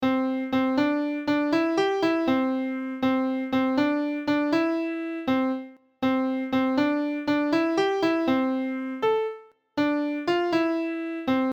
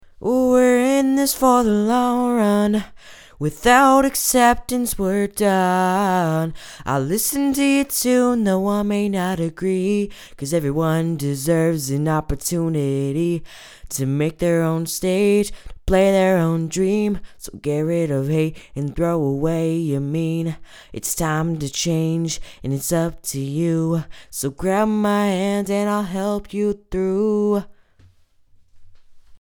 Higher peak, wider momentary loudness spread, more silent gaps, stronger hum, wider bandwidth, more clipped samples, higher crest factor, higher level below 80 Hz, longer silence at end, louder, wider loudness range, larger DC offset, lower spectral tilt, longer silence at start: second, -12 dBFS vs 0 dBFS; second, 6 LU vs 10 LU; neither; neither; second, 8.2 kHz vs over 20 kHz; neither; second, 14 dB vs 20 dB; second, -64 dBFS vs -42 dBFS; about the same, 0 s vs 0.05 s; second, -25 LUFS vs -20 LUFS; second, 1 LU vs 5 LU; neither; about the same, -5.5 dB/octave vs -5.5 dB/octave; second, 0 s vs 0.2 s